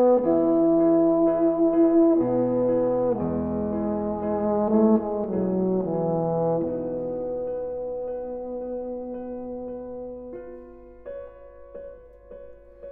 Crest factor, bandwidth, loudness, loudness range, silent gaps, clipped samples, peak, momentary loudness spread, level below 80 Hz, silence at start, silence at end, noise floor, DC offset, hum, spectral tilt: 16 dB; 2.7 kHz; -24 LUFS; 16 LU; none; under 0.1%; -8 dBFS; 22 LU; -52 dBFS; 0 s; 0 s; -45 dBFS; under 0.1%; none; -13.5 dB/octave